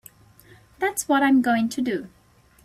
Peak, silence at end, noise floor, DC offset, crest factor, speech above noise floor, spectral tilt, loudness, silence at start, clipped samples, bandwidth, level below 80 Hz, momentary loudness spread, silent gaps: -8 dBFS; 0.55 s; -52 dBFS; under 0.1%; 16 dB; 31 dB; -3.5 dB/octave; -22 LUFS; 0.8 s; under 0.1%; 15 kHz; -62 dBFS; 9 LU; none